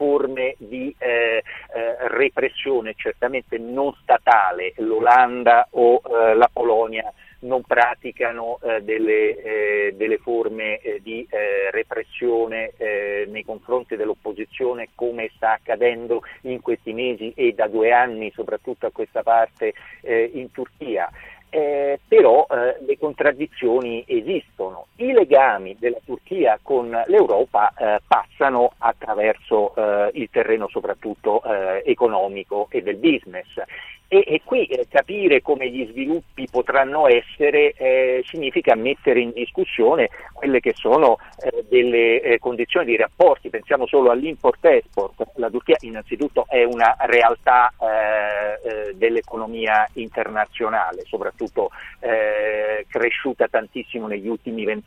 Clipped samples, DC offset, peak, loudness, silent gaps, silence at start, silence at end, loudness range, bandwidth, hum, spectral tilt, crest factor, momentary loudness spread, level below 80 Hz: under 0.1%; under 0.1%; -2 dBFS; -20 LUFS; none; 0 s; 0.05 s; 6 LU; 6 kHz; none; -6 dB/octave; 18 dB; 12 LU; -54 dBFS